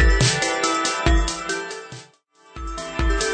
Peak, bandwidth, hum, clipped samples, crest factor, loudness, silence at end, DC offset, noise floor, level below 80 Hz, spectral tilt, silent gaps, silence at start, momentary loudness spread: -6 dBFS; 9.4 kHz; none; under 0.1%; 16 dB; -21 LUFS; 0 s; under 0.1%; -53 dBFS; -24 dBFS; -3.5 dB/octave; none; 0 s; 17 LU